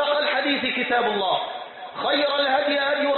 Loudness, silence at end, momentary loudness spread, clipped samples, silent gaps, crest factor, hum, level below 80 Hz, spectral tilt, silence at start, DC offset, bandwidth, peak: -22 LUFS; 0 s; 9 LU; under 0.1%; none; 14 dB; none; -68 dBFS; -7.5 dB/octave; 0 s; under 0.1%; 4.4 kHz; -8 dBFS